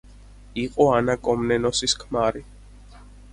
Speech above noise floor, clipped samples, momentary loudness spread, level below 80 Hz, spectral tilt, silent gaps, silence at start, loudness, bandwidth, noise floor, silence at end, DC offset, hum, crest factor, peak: 24 dB; under 0.1%; 11 LU; -44 dBFS; -4 dB/octave; none; 0.05 s; -22 LUFS; 11.5 kHz; -46 dBFS; 0.3 s; under 0.1%; 50 Hz at -45 dBFS; 20 dB; -4 dBFS